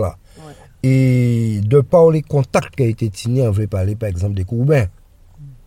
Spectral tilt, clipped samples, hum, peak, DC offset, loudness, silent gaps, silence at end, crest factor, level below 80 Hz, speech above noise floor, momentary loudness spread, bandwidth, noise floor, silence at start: -8 dB/octave; under 0.1%; none; 0 dBFS; under 0.1%; -16 LUFS; none; 0.15 s; 16 dB; -42 dBFS; 26 dB; 9 LU; 14 kHz; -41 dBFS; 0 s